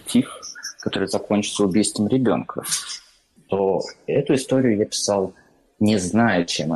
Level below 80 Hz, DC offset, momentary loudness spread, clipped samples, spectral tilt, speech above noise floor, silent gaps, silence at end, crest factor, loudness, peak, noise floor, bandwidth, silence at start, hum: -58 dBFS; under 0.1%; 11 LU; under 0.1%; -4.5 dB/octave; 34 dB; none; 0 s; 14 dB; -21 LUFS; -8 dBFS; -55 dBFS; 12.5 kHz; 0.05 s; none